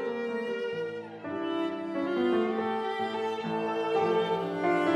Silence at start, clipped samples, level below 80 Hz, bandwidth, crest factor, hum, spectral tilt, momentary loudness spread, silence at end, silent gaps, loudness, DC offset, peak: 0 s; under 0.1%; -82 dBFS; 10.5 kHz; 16 dB; none; -6.5 dB/octave; 7 LU; 0 s; none; -30 LUFS; under 0.1%; -14 dBFS